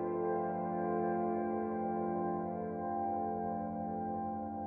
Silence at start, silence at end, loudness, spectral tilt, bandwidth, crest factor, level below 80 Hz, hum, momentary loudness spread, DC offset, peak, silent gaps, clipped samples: 0 s; 0 s; -37 LUFS; -10.5 dB/octave; 2.8 kHz; 12 dB; -68 dBFS; none; 4 LU; under 0.1%; -24 dBFS; none; under 0.1%